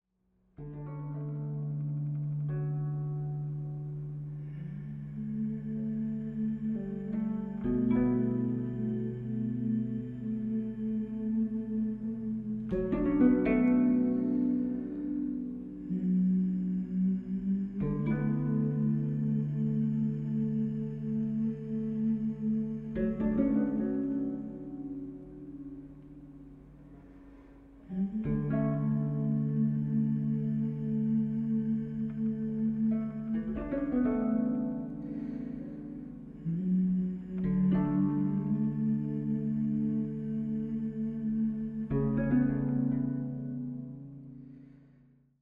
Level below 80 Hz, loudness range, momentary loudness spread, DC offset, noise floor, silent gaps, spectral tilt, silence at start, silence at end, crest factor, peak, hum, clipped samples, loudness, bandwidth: -54 dBFS; 7 LU; 12 LU; under 0.1%; -72 dBFS; none; -12 dB/octave; 0.6 s; 0.7 s; 18 dB; -14 dBFS; none; under 0.1%; -32 LUFS; 3.3 kHz